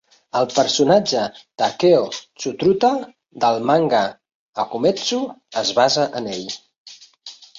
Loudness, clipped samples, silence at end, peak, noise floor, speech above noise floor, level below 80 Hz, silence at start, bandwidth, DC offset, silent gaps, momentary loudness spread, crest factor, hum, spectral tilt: -19 LUFS; under 0.1%; 0.15 s; -2 dBFS; -42 dBFS; 24 dB; -62 dBFS; 0.35 s; 7.8 kHz; under 0.1%; 4.35-4.53 s, 6.76-6.85 s; 14 LU; 18 dB; none; -4 dB/octave